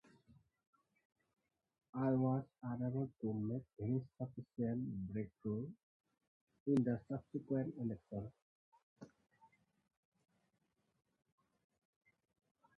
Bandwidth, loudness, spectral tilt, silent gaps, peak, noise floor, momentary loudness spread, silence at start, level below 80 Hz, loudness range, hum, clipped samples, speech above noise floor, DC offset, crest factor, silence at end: 5.6 kHz; -42 LUFS; -11 dB/octave; 5.83-6.00 s, 6.27-6.47 s, 6.60-6.66 s, 8.42-8.72 s, 8.83-8.96 s; -24 dBFS; -84 dBFS; 13 LU; 1.95 s; -74 dBFS; 7 LU; none; under 0.1%; 43 dB; under 0.1%; 20 dB; 3.7 s